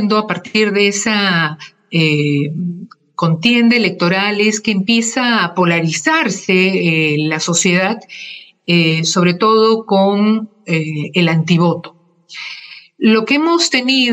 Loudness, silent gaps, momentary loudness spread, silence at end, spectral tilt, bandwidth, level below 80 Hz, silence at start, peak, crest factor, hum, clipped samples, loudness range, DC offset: -14 LUFS; none; 13 LU; 0 s; -4.5 dB/octave; 15 kHz; -62 dBFS; 0 s; 0 dBFS; 14 dB; none; under 0.1%; 2 LU; under 0.1%